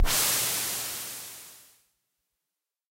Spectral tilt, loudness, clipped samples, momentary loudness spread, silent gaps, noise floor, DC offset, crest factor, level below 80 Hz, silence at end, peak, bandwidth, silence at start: -0.5 dB/octave; -26 LUFS; under 0.1%; 20 LU; none; -87 dBFS; under 0.1%; 20 dB; -38 dBFS; 1.35 s; -12 dBFS; 16 kHz; 0 s